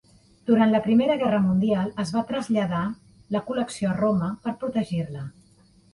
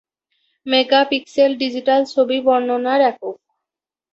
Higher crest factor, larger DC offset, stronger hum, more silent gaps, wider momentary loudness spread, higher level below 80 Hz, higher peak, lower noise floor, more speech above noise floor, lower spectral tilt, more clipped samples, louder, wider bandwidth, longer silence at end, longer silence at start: about the same, 16 dB vs 16 dB; neither; neither; neither; first, 12 LU vs 7 LU; first, -58 dBFS vs -66 dBFS; second, -8 dBFS vs -2 dBFS; second, -57 dBFS vs -86 dBFS; second, 34 dB vs 70 dB; first, -7 dB/octave vs -3.5 dB/octave; neither; second, -24 LUFS vs -17 LUFS; first, 11.5 kHz vs 7.8 kHz; second, 0.65 s vs 0.8 s; second, 0.45 s vs 0.65 s